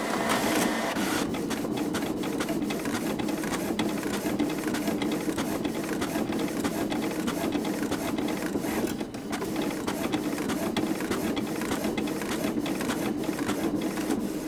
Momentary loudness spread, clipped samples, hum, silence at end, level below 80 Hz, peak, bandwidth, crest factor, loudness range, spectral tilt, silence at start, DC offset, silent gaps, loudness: 3 LU; under 0.1%; none; 0 s; -54 dBFS; -10 dBFS; over 20 kHz; 18 dB; 1 LU; -4.5 dB/octave; 0 s; under 0.1%; none; -29 LUFS